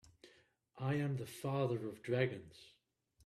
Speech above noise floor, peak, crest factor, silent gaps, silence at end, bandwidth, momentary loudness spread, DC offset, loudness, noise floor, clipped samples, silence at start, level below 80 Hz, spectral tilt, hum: 31 dB; -20 dBFS; 20 dB; none; 0.55 s; 14 kHz; 14 LU; under 0.1%; -39 LUFS; -70 dBFS; under 0.1%; 0.25 s; -76 dBFS; -7 dB/octave; none